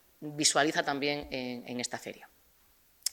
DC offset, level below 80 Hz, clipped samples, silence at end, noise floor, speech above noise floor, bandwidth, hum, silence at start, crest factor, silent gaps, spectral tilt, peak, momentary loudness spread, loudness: under 0.1%; -64 dBFS; under 0.1%; 0 s; -65 dBFS; 33 dB; over 20 kHz; none; 0.2 s; 24 dB; none; -2 dB/octave; -10 dBFS; 17 LU; -31 LUFS